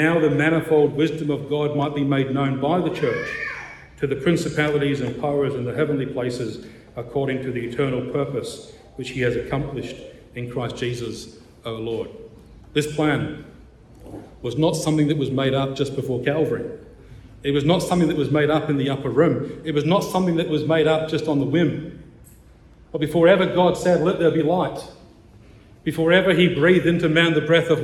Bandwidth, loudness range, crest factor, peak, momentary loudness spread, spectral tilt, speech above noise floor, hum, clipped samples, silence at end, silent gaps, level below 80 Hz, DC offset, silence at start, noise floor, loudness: 13.5 kHz; 7 LU; 18 dB; -2 dBFS; 17 LU; -6.5 dB/octave; 28 dB; none; under 0.1%; 0 s; none; -50 dBFS; under 0.1%; 0 s; -48 dBFS; -21 LUFS